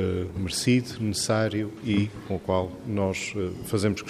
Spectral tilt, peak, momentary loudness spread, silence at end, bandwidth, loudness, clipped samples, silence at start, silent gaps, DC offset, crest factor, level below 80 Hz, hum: -5 dB/octave; -10 dBFS; 7 LU; 0 s; 15.5 kHz; -27 LUFS; under 0.1%; 0 s; none; under 0.1%; 18 dB; -54 dBFS; none